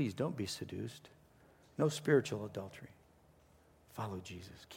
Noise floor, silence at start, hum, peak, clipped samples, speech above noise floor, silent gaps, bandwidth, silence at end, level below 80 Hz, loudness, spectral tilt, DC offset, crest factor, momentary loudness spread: -66 dBFS; 0 s; none; -18 dBFS; under 0.1%; 28 dB; none; 16.5 kHz; 0 s; -72 dBFS; -38 LUFS; -5.5 dB/octave; under 0.1%; 22 dB; 20 LU